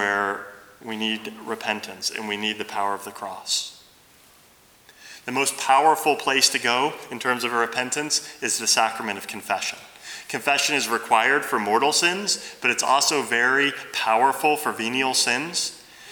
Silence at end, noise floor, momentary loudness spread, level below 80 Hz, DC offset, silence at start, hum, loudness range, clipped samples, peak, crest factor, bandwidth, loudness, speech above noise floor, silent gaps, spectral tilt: 0 s; -54 dBFS; 13 LU; -72 dBFS; under 0.1%; 0 s; none; 8 LU; under 0.1%; -4 dBFS; 20 dB; over 20 kHz; -22 LUFS; 31 dB; none; -1 dB/octave